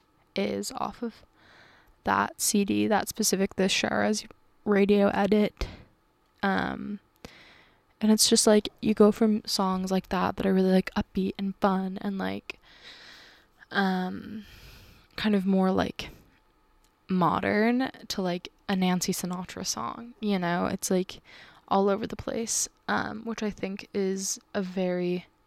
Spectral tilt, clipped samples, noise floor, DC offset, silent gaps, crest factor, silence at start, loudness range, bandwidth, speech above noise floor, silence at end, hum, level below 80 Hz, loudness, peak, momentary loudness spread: -4.5 dB/octave; under 0.1%; -66 dBFS; under 0.1%; none; 20 dB; 0.35 s; 6 LU; 15 kHz; 39 dB; 0.25 s; none; -54 dBFS; -27 LUFS; -8 dBFS; 14 LU